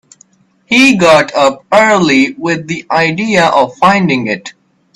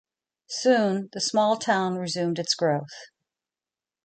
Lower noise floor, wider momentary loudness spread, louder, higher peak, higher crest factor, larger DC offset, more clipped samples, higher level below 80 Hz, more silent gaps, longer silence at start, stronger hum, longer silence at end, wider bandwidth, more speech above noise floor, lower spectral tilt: second, -49 dBFS vs under -90 dBFS; about the same, 9 LU vs 10 LU; first, -10 LUFS vs -25 LUFS; first, 0 dBFS vs -8 dBFS; second, 10 dB vs 18 dB; neither; neither; first, -50 dBFS vs -74 dBFS; neither; first, 0.7 s vs 0.5 s; neither; second, 0.45 s vs 1 s; first, 13 kHz vs 9.2 kHz; second, 39 dB vs over 65 dB; about the same, -4.5 dB/octave vs -4 dB/octave